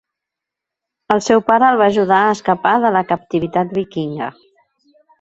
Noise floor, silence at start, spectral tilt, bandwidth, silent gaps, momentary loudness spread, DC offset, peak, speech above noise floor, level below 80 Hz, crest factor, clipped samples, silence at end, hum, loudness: -83 dBFS; 1.1 s; -5.5 dB/octave; 8.2 kHz; none; 11 LU; under 0.1%; 0 dBFS; 69 dB; -56 dBFS; 16 dB; under 0.1%; 0.9 s; none; -15 LUFS